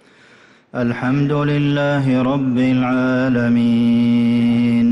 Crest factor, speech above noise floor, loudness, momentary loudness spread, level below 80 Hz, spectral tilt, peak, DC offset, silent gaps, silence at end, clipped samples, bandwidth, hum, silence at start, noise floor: 8 dB; 33 dB; -16 LUFS; 4 LU; -50 dBFS; -8.5 dB/octave; -8 dBFS; under 0.1%; none; 0 s; under 0.1%; 6.2 kHz; none; 0.75 s; -48 dBFS